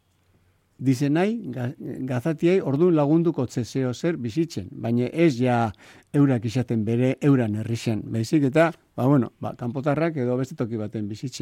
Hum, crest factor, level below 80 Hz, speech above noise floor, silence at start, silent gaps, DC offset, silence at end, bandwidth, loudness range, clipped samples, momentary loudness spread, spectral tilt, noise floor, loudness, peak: none; 16 dB; -62 dBFS; 40 dB; 0.8 s; none; under 0.1%; 0 s; 15 kHz; 1 LU; under 0.1%; 10 LU; -7.5 dB/octave; -63 dBFS; -24 LUFS; -8 dBFS